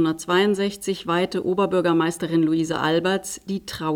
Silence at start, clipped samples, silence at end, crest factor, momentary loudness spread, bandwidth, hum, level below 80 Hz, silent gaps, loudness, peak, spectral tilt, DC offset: 0 s; under 0.1%; 0 s; 14 dB; 8 LU; 17 kHz; none; -56 dBFS; none; -22 LUFS; -8 dBFS; -5 dB/octave; under 0.1%